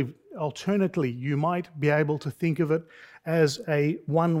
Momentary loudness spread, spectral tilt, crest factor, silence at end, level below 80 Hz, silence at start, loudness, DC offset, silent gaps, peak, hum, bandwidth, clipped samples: 7 LU; -7 dB/octave; 16 dB; 0 s; -68 dBFS; 0 s; -27 LUFS; under 0.1%; none; -10 dBFS; none; 15 kHz; under 0.1%